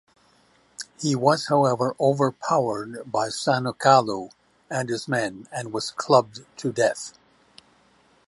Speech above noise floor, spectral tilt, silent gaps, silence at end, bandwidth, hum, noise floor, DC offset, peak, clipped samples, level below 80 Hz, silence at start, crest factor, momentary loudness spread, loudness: 37 dB; -5 dB/octave; none; 1.2 s; 11.5 kHz; none; -60 dBFS; under 0.1%; -4 dBFS; under 0.1%; -68 dBFS; 0.8 s; 22 dB; 14 LU; -23 LUFS